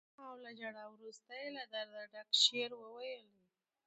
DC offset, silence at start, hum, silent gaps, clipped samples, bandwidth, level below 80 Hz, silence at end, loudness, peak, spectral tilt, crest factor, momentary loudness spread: under 0.1%; 0.2 s; none; none; under 0.1%; 8.8 kHz; under -90 dBFS; 0.65 s; -37 LUFS; -16 dBFS; 0 dB/octave; 26 dB; 23 LU